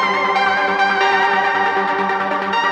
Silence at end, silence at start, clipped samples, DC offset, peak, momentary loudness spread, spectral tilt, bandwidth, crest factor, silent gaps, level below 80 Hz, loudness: 0 s; 0 s; under 0.1%; under 0.1%; -4 dBFS; 4 LU; -3.5 dB/octave; 9.8 kHz; 12 dB; none; -64 dBFS; -16 LUFS